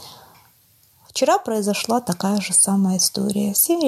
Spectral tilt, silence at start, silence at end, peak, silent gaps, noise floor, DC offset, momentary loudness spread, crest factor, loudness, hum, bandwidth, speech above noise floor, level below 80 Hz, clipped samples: -3.5 dB/octave; 0 s; 0 s; -6 dBFS; none; -56 dBFS; under 0.1%; 7 LU; 16 dB; -19 LUFS; none; 14.5 kHz; 37 dB; -64 dBFS; under 0.1%